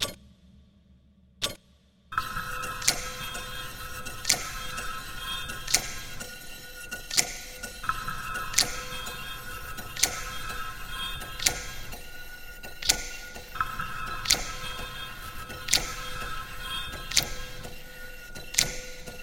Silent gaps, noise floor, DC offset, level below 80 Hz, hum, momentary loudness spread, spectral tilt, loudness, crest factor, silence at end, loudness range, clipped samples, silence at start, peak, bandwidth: none; -60 dBFS; 0.3%; -44 dBFS; none; 16 LU; -0.5 dB/octave; -30 LUFS; 32 dB; 0 s; 2 LU; under 0.1%; 0 s; 0 dBFS; 17 kHz